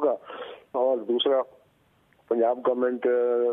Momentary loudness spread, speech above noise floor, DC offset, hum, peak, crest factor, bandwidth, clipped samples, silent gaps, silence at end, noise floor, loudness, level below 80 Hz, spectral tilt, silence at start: 12 LU; 40 dB; under 0.1%; none; -12 dBFS; 14 dB; 3.9 kHz; under 0.1%; none; 0 s; -64 dBFS; -25 LUFS; -78 dBFS; -6.5 dB/octave; 0 s